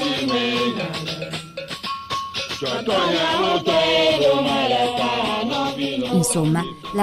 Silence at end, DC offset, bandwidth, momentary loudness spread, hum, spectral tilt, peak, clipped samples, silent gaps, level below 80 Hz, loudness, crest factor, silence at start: 0 s; under 0.1%; 16 kHz; 11 LU; none; -4 dB/octave; -6 dBFS; under 0.1%; none; -52 dBFS; -20 LUFS; 14 dB; 0 s